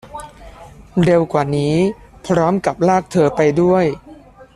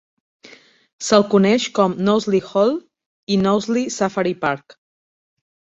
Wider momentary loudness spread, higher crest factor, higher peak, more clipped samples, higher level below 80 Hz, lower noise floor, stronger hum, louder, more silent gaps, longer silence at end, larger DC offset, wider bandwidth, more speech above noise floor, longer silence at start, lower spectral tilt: first, 14 LU vs 10 LU; about the same, 14 dB vs 18 dB; about the same, -2 dBFS vs 0 dBFS; neither; first, -44 dBFS vs -58 dBFS; second, -41 dBFS vs -47 dBFS; neither; about the same, -16 LUFS vs -18 LUFS; second, none vs 3.06-3.27 s; second, 0.4 s vs 1.15 s; neither; first, 12 kHz vs 8.2 kHz; about the same, 26 dB vs 29 dB; second, 0.05 s vs 1 s; first, -7 dB/octave vs -5 dB/octave